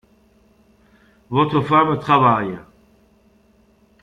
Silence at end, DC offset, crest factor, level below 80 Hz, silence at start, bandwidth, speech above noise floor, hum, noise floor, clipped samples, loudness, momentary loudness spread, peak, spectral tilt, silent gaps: 1.45 s; under 0.1%; 18 dB; -56 dBFS; 1.3 s; 9.4 kHz; 39 dB; none; -56 dBFS; under 0.1%; -17 LUFS; 12 LU; -2 dBFS; -8 dB/octave; none